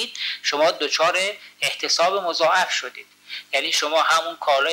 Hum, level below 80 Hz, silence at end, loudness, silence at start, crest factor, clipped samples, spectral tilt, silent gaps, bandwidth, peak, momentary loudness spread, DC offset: 50 Hz at -70 dBFS; -86 dBFS; 0 s; -20 LUFS; 0 s; 14 dB; under 0.1%; 0 dB/octave; none; 16 kHz; -8 dBFS; 7 LU; under 0.1%